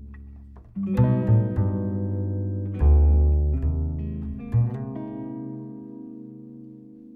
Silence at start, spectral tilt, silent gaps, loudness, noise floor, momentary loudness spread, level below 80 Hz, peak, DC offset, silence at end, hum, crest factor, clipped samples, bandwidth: 0 s; -12 dB/octave; none; -24 LUFS; -44 dBFS; 23 LU; -26 dBFS; -8 dBFS; under 0.1%; 0 s; none; 16 dB; under 0.1%; 2.8 kHz